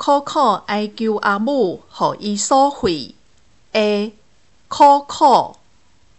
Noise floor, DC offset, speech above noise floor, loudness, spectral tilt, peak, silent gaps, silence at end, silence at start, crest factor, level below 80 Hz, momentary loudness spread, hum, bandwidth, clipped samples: -57 dBFS; 0.3%; 41 dB; -17 LUFS; -4 dB/octave; -2 dBFS; none; 0.65 s; 0 s; 16 dB; -52 dBFS; 11 LU; none; 8.4 kHz; under 0.1%